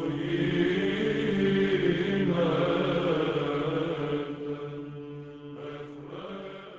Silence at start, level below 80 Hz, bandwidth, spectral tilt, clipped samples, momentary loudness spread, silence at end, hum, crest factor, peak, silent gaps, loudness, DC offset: 0 s; -56 dBFS; 8 kHz; -7.5 dB/octave; under 0.1%; 15 LU; 0 s; none; 14 dB; -14 dBFS; none; -28 LUFS; under 0.1%